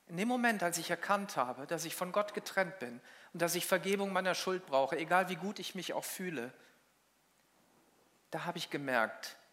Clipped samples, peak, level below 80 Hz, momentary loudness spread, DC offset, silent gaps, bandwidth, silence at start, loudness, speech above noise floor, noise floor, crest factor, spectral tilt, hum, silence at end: under 0.1%; -16 dBFS; -90 dBFS; 11 LU; under 0.1%; none; 16 kHz; 0.1 s; -35 LUFS; 36 dB; -72 dBFS; 22 dB; -3.5 dB/octave; none; 0.15 s